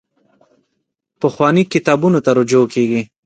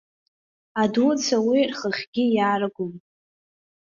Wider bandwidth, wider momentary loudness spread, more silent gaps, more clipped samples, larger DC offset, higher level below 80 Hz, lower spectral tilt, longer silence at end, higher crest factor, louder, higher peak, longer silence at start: first, 9.2 kHz vs 7.4 kHz; second, 5 LU vs 11 LU; second, none vs 2.07-2.13 s; neither; neither; first, -60 dBFS vs -68 dBFS; first, -6.5 dB/octave vs -4.5 dB/octave; second, 0.2 s vs 0.9 s; about the same, 16 dB vs 16 dB; first, -14 LUFS vs -22 LUFS; first, 0 dBFS vs -8 dBFS; first, 1.2 s vs 0.75 s